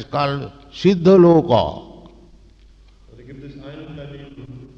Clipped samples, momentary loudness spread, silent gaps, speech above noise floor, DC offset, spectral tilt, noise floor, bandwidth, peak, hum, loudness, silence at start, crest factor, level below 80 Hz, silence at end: under 0.1%; 26 LU; none; 32 dB; under 0.1%; -8 dB/octave; -48 dBFS; 7 kHz; -2 dBFS; none; -15 LUFS; 0 s; 16 dB; -46 dBFS; 0.15 s